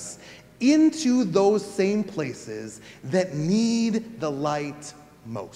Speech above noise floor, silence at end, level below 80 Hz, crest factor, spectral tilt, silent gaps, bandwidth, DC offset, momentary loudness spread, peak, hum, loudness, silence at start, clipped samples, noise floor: 21 dB; 0.05 s; -64 dBFS; 16 dB; -5.5 dB/octave; none; 12.5 kHz; under 0.1%; 18 LU; -8 dBFS; none; -24 LUFS; 0 s; under 0.1%; -45 dBFS